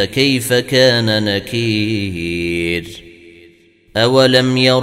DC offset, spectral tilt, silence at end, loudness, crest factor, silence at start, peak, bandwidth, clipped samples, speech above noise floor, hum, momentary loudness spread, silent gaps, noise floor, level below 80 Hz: under 0.1%; -5 dB/octave; 0 s; -14 LUFS; 16 dB; 0 s; 0 dBFS; 16 kHz; under 0.1%; 34 dB; none; 10 LU; none; -48 dBFS; -46 dBFS